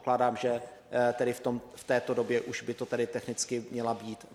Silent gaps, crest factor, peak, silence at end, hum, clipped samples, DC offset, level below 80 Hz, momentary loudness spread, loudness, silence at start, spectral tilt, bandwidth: none; 18 dB; -14 dBFS; 0 s; none; under 0.1%; under 0.1%; -70 dBFS; 8 LU; -32 LUFS; 0 s; -4.5 dB/octave; 15 kHz